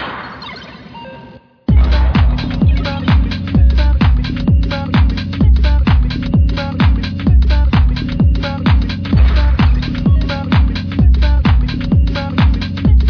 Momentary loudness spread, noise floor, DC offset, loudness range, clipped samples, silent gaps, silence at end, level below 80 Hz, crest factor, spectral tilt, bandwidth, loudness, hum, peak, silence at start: 4 LU; -38 dBFS; under 0.1%; 1 LU; under 0.1%; none; 0 s; -14 dBFS; 10 dB; -8.5 dB/octave; 5.4 kHz; -14 LUFS; none; -2 dBFS; 0 s